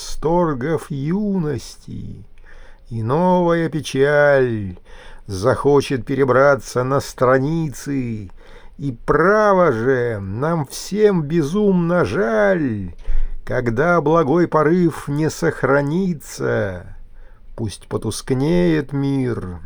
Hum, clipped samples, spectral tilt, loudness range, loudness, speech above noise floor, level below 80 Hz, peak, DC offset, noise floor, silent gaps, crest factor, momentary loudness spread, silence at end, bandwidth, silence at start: none; under 0.1%; -6.5 dB/octave; 5 LU; -18 LUFS; 20 dB; -32 dBFS; -2 dBFS; under 0.1%; -38 dBFS; none; 16 dB; 14 LU; 0 s; over 20 kHz; 0 s